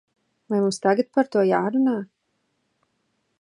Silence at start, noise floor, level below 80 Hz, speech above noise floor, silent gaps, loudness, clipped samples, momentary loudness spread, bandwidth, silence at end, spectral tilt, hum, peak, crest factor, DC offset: 0.5 s; -73 dBFS; -76 dBFS; 52 dB; none; -22 LUFS; under 0.1%; 7 LU; 11 kHz; 1.35 s; -6 dB/octave; none; -6 dBFS; 18 dB; under 0.1%